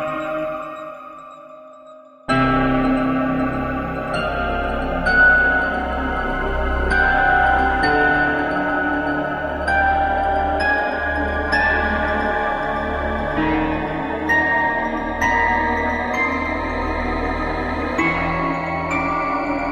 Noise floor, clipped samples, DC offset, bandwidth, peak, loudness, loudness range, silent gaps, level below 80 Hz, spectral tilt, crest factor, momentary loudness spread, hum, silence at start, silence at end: -43 dBFS; under 0.1%; under 0.1%; 12 kHz; -4 dBFS; -19 LUFS; 4 LU; none; -32 dBFS; -6.5 dB/octave; 16 dB; 8 LU; none; 0 s; 0 s